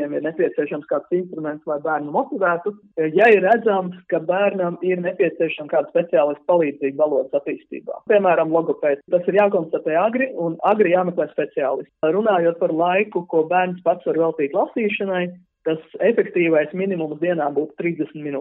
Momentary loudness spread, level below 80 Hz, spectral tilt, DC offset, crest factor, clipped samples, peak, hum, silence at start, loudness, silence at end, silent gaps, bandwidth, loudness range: 8 LU; -72 dBFS; -9 dB/octave; under 0.1%; 16 dB; under 0.1%; -4 dBFS; none; 0 s; -20 LUFS; 0 s; none; 4.1 kHz; 2 LU